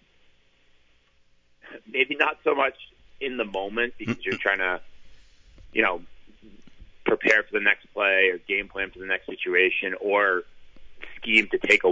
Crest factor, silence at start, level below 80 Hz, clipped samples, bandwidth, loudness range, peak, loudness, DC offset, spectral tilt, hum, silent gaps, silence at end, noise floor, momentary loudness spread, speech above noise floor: 22 dB; 1.65 s; -58 dBFS; under 0.1%; 8 kHz; 5 LU; -6 dBFS; -24 LUFS; under 0.1%; -4 dB/octave; none; none; 0 s; -61 dBFS; 11 LU; 36 dB